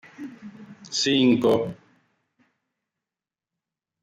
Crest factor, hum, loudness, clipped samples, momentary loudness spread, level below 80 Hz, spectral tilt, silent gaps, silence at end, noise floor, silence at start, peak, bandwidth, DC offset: 20 dB; none; -22 LUFS; under 0.1%; 25 LU; -66 dBFS; -4.5 dB/octave; none; 2.3 s; under -90 dBFS; 0.2 s; -8 dBFS; 13 kHz; under 0.1%